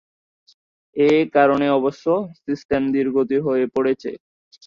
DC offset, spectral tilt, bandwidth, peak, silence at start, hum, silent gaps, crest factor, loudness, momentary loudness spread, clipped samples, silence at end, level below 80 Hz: under 0.1%; -7 dB/octave; 7.2 kHz; -2 dBFS; 0.95 s; none; 2.65-2.69 s; 18 dB; -19 LUFS; 12 LU; under 0.1%; 0.5 s; -58 dBFS